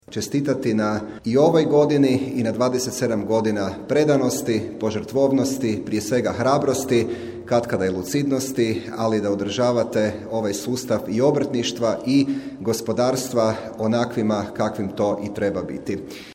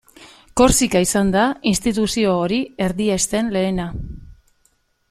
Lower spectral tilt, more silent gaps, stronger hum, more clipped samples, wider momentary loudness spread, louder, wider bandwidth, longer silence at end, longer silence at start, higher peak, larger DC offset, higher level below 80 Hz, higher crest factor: first, -5.5 dB/octave vs -4 dB/octave; neither; neither; neither; second, 7 LU vs 11 LU; second, -22 LUFS vs -18 LUFS; about the same, 17 kHz vs 15.5 kHz; second, 0 s vs 0.75 s; about the same, 0.1 s vs 0.2 s; about the same, -4 dBFS vs -2 dBFS; neither; second, -56 dBFS vs -36 dBFS; about the same, 16 dB vs 18 dB